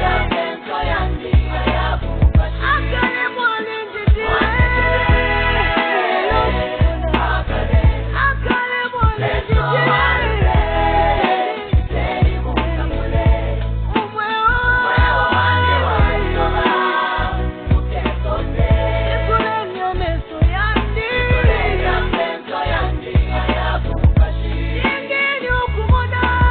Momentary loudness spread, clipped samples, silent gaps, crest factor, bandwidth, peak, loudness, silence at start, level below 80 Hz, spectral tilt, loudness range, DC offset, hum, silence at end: 6 LU; under 0.1%; none; 14 dB; 4.5 kHz; -2 dBFS; -17 LUFS; 0 s; -20 dBFS; -4 dB/octave; 3 LU; under 0.1%; none; 0 s